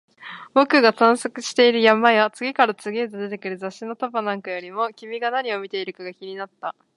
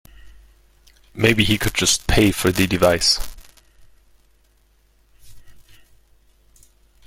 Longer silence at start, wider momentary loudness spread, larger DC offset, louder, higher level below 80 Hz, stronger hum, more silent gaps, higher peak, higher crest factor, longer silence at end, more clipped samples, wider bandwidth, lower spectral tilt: about the same, 0.2 s vs 0.25 s; first, 18 LU vs 5 LU; neither; second, -20 LUFS vs -17 LUFS; second, -76 dBFS vs -36 dBFS; neither; neither; about the same, 0 dBFS vs -2 dBFS; about the same, 20 dB vs 22 dB; second, 0.25 s vs 1.45 s; neither; second, 11.5 kHz vs 16.5 kHz; about the same, -3.5 dB/octave vs -3.5 dB/octave